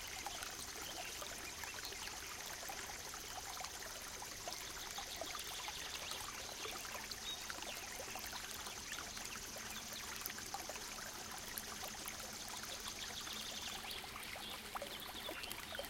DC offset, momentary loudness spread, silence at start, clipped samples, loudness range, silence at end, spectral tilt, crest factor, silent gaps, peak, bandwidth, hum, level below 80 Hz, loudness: under 0.1%; 2 LU; 0 s; under 0.1%; 1 LU; 0 s; -0.5 dB/octave; 26 dB; none; -22 dBFS; 17 kHz; none; -64 dBFS; -45 LUFS